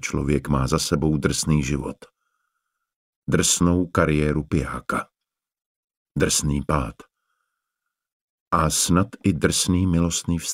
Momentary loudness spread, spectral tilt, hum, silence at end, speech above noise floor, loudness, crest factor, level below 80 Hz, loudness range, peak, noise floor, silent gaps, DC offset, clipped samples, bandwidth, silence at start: 9 LU; -4.5 dB/octave; none; 0 s; 65 dB; -22 LUFS; 20 dB; -38 dBFS; 4 LU; -2 dBFS; -87 dBFS; 2.96-3.22 s, 5.61-5.88 s, 5.97-6.06 s, 8.12-8.51 s; under 0.1%; under 0.1%; 16 kHz; 0 s